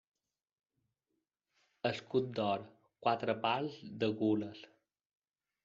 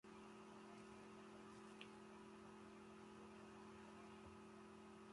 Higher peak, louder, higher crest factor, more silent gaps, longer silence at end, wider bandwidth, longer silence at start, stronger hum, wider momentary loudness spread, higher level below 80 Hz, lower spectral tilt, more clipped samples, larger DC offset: first, -16 dBFS vs -40 dBFS; first, -36 LUFS vs -61 LUFS; about the same, 22 dB vs 20 dB; neither; first, 1 s vs 0 s; second, 7.4 kHz vs 11.5 kHz; first, 1.85 s vs 0.05 s; second, none vs 60 Hz at -80 dBFS; first, 7 LU vs 2 LU; about the same, -78 dBFS vs -82 dBFS; about the same, -4.5 dB/octave vs -5 dB/octave; neither; neither